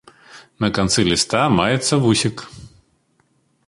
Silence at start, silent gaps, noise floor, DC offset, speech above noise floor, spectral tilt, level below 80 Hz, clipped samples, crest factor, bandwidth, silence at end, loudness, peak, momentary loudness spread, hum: 0.35 s; none; -63 dBFS; under 0.1%; 45 dB; -4 dB/octave; -44 dBFS; under 0.1%; 20 dB; 11.5 kHz; 1 s; -17 LUFS; 0 dBFS; 8 LU; none